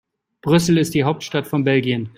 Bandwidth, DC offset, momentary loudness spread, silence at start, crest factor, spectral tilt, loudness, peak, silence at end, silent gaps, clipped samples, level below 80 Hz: 16 kHz; under 0.1%; 7 LU; 0.45 s; 16 dB; -6 dB/octave; -18 LUFS; -2 dBFS; 0.1 s; none; under 0.1%; -52 dBFS